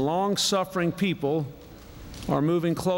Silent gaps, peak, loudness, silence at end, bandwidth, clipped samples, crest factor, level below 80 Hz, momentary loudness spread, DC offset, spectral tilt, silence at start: none; -10 dBFS; -26 LUFS; 0 s; 16.5 kHz; under 0.1%; 16 dB; -50 dBFS; 20 LU; under 0.1%; -5 dB/octave; 0 s